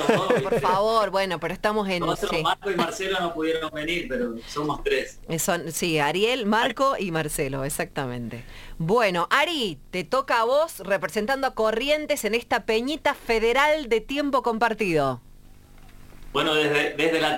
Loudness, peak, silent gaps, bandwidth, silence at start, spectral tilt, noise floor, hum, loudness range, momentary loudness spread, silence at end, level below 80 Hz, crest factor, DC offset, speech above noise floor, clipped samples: -24 LUFS; -4 dBFS; none; 17 kHz; 0 s; -4 dB/octave; -47 dBFS; none; 3 LU; 8 LU; 0 s; -46 dBFS; 20 dB; under 0.1%; 23 dB; under 0.1%